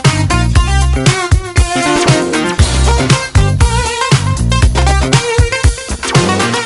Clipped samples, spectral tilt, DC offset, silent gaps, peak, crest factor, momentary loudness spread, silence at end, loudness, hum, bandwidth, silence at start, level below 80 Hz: under 0.1%; -4.5 dB/octave; under 0.1%; none; 0 dBFS; 10 dB; 3 LU; 0 s; -12 LUFS; none; 11.5 kHz; 0 s; -16 dBFS